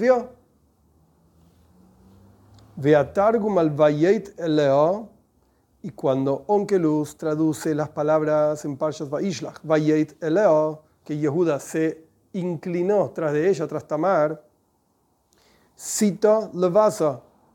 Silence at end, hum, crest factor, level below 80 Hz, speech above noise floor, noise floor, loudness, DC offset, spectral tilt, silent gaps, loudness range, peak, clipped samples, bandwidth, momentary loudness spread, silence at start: 0.35 s; none; 18 dB; -64 dBFS; 45 dB; -67 dBFS; -22 LUFS; under 0.1%; -6.5 dB/octave; none; 4 LU; -6 dBFS; under 0.1%; 17 kHz; 10 LU; 0 s